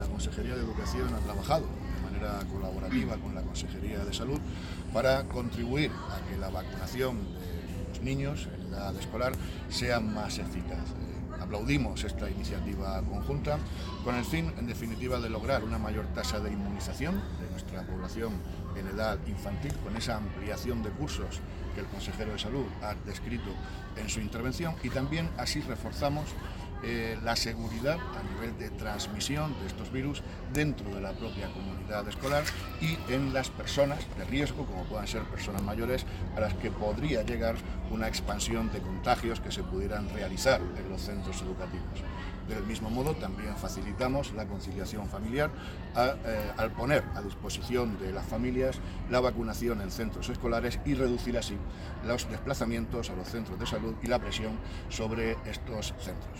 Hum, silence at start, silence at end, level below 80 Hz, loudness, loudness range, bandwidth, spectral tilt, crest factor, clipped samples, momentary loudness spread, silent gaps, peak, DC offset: none; 0 s; 0 s; -40 dBFS; -34 LUFS; 4 LU; 17 kHz; -5.5 dB/octave; 20 dB; under 0.1%; 8 LU; none; -12 dBFS; under 0.1%